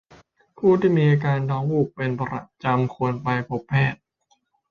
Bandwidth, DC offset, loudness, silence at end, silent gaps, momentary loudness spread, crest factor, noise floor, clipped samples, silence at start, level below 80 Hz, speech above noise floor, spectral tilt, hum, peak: 6.6 kHz; under 0.1%; -22 LUFS; 0.75 s; none; 9 LU; 16 dB; -67 dBFS; under 0.1%; 0.6 s; -56 dBFS; 46 dB; -9 dB/octave; none; -6 dBFS